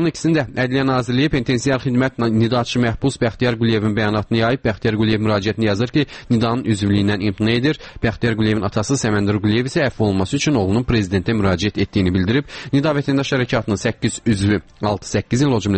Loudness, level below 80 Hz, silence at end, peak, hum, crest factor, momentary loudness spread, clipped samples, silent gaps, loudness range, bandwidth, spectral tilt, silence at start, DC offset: -18 LUFS; -40 dBFS; 0 s; -4 dBFS; none; 12 dB; 3 LU; under 0.1%; none; 1 LU; 8.8 kHz; -6 dB/octave; 0 s; under 0.1%